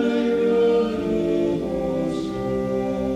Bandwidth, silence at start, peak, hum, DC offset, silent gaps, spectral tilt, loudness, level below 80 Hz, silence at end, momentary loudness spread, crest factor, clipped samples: 11 kHz; 0 s; -10 dBFS; none; under 0.1%; none; -7.5 dB/octave; -22 LUFS; -44 dBFS; 0 s; 7 LU; 12 dB; under 0.1%